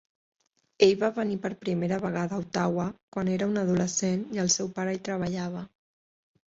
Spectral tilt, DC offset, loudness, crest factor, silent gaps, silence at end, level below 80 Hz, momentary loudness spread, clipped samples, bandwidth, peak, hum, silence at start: -4.5 dB/octave; under 0.1%; -28 LUFS; 22 dB; 3.03-3.12 s; 0.8 s; -64 dBFS; 9 LU; under 0.1%; 8 kHz; -6 dBFS; none; 0.8 s